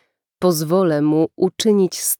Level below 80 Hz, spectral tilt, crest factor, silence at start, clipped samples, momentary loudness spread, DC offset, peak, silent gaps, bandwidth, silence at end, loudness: -64 dBFS; -5 dB/octave; 12 dB; 0.4 s; under 0.1%; 3 LU; under 0.1%; -6 dBFS; none; 19 kHz; 0.05 s; -18 LUFS